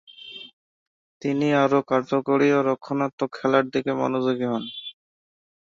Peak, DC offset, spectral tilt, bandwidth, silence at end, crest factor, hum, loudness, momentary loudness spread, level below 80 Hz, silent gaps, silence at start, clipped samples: -4 dBFS; under 0.1%; -6.5 dB/octave; 7.4 kHz; 0.75 s; 20 dB; none; -23 LUFS; 18 LU; -68 dBFS; 0.53-1.21 s, 3.13-3.18 s; 0.2 s; under 0.1%